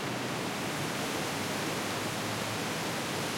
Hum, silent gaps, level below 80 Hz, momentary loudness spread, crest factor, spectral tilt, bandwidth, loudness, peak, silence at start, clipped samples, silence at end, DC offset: none; none; -66 dBFS; 1 LU; 14 dB; -3.5 dB/octave; 16.5 kHz; -33 LUFS; -20 dBFS; 0 s; under 0.1%; 0 s; under 0.1%